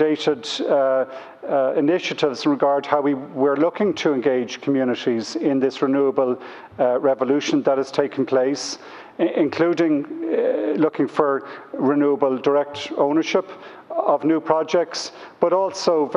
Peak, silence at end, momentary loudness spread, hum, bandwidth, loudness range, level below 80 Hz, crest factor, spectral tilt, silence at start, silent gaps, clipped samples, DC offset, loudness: -2 dBFS; 0 s; 8 LU; none; 10.5 kHz; 1 LU; -70 dBFS; 18 dB; -5 dB/octave; 0 s; none; under 0.1%; under 0.1%; -21 LUFS